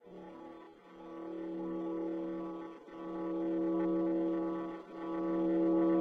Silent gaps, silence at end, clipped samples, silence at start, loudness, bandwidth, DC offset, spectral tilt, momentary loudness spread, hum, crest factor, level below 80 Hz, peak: none; 0 s; under 0.1%; 0.05 s; -36 LUFS; 3.8 kHz; under 0.1%; -9.5 dB/octave; 19 LU; none; 14 dB; -68 dBFS; -22 dBFS